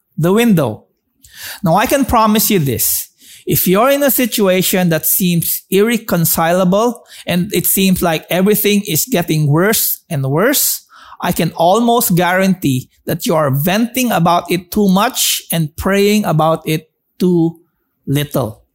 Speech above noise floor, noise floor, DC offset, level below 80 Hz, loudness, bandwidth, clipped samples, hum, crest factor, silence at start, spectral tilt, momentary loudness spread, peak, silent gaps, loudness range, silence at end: 36 dB; -49 dBFS; 0.1%; -44 dBFS; -13 LUFS; 16.5 kHz; under 0.1%; none; 12 dB; 0.2 s; -4.5 dB/octave; 8 LU; -2 dBFS; none; 2 LU; 0.2 s